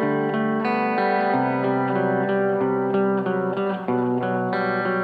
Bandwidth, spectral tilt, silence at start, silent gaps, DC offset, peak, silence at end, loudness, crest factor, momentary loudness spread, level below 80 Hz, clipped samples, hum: 5 kHz; -9.5 dB/octave; 0 s; none; under 0.1%; -10 dBFS; 0 s; -22 LUFS; 12 dB; 3 LU; -68 dBFS; under 0.1%; none